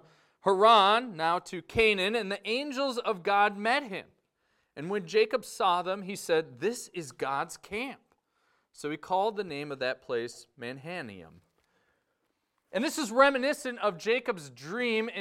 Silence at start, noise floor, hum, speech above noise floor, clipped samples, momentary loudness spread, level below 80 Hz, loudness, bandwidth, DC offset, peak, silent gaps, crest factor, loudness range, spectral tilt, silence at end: 0.45 s; -78 dBFS; none; 49 dB; under 0.1%; 15 LU; -64 dBFS; -29 LUFS; 16 kHz; under 0.1%; -8 dBFS; none; 22 dB; 9 LU; -3.5 dB/octave; 0 s